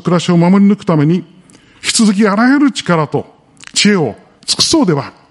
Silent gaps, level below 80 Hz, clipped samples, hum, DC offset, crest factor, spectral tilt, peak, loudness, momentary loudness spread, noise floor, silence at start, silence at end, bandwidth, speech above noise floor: none; -50 dBFS; under 0.1%; none; under 0.1%; 12 dB; -4.5 dB/octave; 0 dBFS; -12 LUFS; 9 LU; -43 dBFS; 0.05 s; 0.2 s; 11.5 kHz; 32 dB